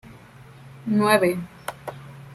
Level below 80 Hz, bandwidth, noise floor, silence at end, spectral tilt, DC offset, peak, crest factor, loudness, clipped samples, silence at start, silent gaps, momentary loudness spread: -60 dBFS; 15.5 kHz; -46 dBFS; 0 s; -5.5 dB/octave; under 0.1%; -4 dBFS; 22 dB; -21 LUFS; under 0.1%; 0.05 s; none; 20 LU